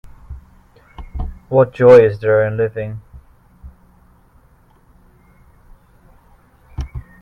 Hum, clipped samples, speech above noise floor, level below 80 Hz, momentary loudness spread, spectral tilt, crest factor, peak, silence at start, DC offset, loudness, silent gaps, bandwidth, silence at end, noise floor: none; under 0.1%; 39 dB; -36 dBFS; 30 LU; -8.5 dB/octave; 18 dB; 0 dBFS; 0.05 s; under 0.1%; -13 LUFS; none; 6.6 kHz; 0.2 s; -51 dBFS